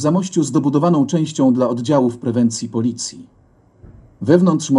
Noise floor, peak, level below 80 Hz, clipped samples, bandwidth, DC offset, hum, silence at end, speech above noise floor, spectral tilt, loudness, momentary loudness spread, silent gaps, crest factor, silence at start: -48 dBFS; 0 dBFS; -56 dBFS; under 0.1%; 11 kHz; under 0.1%; none; 0 s; 32 dB; -6.5 dB/octave; -17 LUFS; 7 LU; none; 16 dB; 0 s